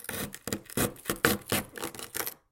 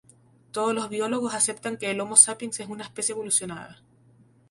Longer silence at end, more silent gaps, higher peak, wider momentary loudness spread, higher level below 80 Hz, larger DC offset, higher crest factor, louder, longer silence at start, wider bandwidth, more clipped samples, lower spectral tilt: second, 0.15 s vs 0.75 s; neither; about the same, -4 dBFS vs -2 dBFS; second, 10 LU vs 19 LU; first, -54 dBFS vs -70 dBFS; neither; about the same, 30 dB vs 26 dB; second, -32 LUFS vs -23 LUFS; second, 0 s vs 0.55 s; first, 17 kHz vs 12 kHz; neither; first, -3 dB/octave vs -1.5 dB/octave